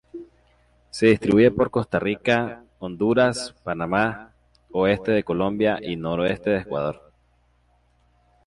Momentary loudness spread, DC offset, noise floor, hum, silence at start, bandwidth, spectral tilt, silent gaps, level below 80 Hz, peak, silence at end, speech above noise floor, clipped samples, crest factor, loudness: 17 LU; under 0.1%; -62 dBFS; 60 Hz at -50 dBFS; 0.15 s; 11.5 kHz; -6 dB/octave; none; -52 dBFS; -4 dBFS; 1.5 s; 41 dB; under 0.1%; 18 dB; -22 LUFS